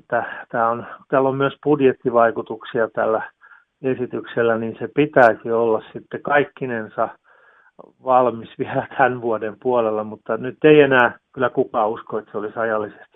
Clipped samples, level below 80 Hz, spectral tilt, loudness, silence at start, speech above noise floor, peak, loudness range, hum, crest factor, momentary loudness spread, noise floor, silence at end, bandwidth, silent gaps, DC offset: under 0.1%; -64 dBFS; -8.5 dB/octave; -20 LUFS; 0.1 s; 34 dB; 0 dBFS; 4 LU; none; 20 dB; 12 LU; -53 dBFS; 0.25 s; 4.7 kHz; none; under 0.1%